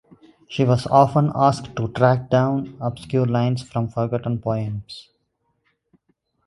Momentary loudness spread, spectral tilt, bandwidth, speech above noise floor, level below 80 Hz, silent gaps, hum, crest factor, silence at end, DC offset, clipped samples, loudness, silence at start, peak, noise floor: 13 LU; -8 dB/octave; 11.5 kHz; 51 dB; -52 dBFS; none; none; 20 dB; 1.45 s; under 0.1%; under 0.1%; -21 LUFS; 0.5 s; 0 dBFS; -71 dBFS